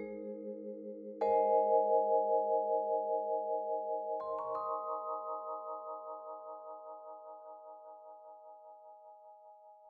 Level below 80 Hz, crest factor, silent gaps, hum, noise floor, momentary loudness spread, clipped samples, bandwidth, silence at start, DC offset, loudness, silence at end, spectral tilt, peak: -82 dBFS; 18 dB; none; none; -58 dBFS; 24 LU; under 0.1%; 4.8 kHz; 0 s; under 0.1%; -35 LUFS; 0 s; -6.5 dB/octave; -18 dBFS